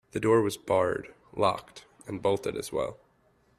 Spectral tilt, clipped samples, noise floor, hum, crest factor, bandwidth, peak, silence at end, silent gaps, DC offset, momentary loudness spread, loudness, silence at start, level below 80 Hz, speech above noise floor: -5.5 dB/octave; under 0.1%; -66 dBFS; none; 20 dB; 14.5 kHz; -10 dBFS; 0.65 s; none; under 0.1%; 14 LU; -29 LUFS; 0.15 s; -60 dBFS; 38 dB